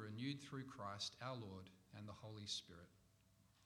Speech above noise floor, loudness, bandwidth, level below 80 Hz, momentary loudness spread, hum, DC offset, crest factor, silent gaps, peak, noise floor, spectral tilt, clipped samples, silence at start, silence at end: 22 dB; -51 LUFS; 19 kHz; -80 dBFS; 14 LU; none; under 0.1%; 20 dB; none; -34 dBFS; -75 dBFS; -4 dB/octave; under 0.1%; 0 s; 0 s